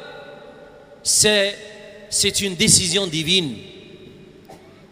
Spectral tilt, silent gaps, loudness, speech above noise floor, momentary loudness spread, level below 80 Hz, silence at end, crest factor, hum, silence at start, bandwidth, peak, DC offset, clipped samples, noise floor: -2 dB/octave; none; -17 LUFS; 26 dB; 23 LU; -50 dBFS; 0.35 s; 22 dB; none; 0 s; 16 kHz; 0 dBFS; under 0.1%; under 0.1%; -44 dBFS